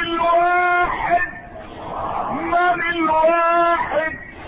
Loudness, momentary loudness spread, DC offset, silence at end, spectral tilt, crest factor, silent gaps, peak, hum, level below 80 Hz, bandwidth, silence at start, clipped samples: -18 LUFS; 12 LU; under 0.1%; 0 s; -9.5 dB/octave; 12 dB; none; -6 dBFS; none; -44 dBFS; 4.9 kHz; 0 s; under 0.1%